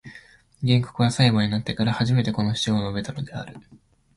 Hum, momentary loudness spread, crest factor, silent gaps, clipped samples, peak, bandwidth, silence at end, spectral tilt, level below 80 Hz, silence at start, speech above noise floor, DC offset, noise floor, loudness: none; 13 LU; 18 dB; none; under 0.1%; -6 dBFS; 11.5 kHz; 0.55 s; -6 dB/octave; -50 dBFS; 0.05 s; 28 dB; under 0.1%; -50 dBFS; -23 LUFS